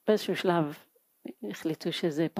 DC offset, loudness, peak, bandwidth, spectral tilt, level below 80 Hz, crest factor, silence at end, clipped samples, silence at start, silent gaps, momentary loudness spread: under 0.1%; -30 LUFS; -10 dBFS; 15.5 kHz; -6 dB/octave; -82 dBFS; 20 dB; 0 s; under 0.1%; 0.05 s; none; 20 LU